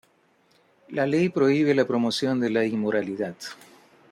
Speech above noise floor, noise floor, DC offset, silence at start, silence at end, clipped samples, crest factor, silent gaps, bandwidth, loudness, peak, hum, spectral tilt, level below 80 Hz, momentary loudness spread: 40 dB; -63 dBFS; under 0.1%; 0.9 s; 0.55 s; under 0.1%; 16 dB; none; 14 kHz; -24 LUFS; -8 dBFS; none; -6 dB/octave; -70 dBFS; 12 LU